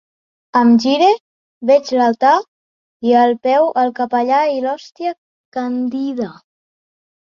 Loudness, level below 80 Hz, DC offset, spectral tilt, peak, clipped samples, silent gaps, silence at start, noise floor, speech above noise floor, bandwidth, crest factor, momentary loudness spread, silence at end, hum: -16 LUFS; -66 dBFS; under 0.1%; -5 dB/octave; 0 dBFS; under 0.1%; 1.20-1.61 s, 2.48-3.00 s, 5.18-5.52 s; 0.55 s; under -90 dBFS; over 76 dB; 7.2 kHz; 16 dB; 12 LU; 0.9 s; none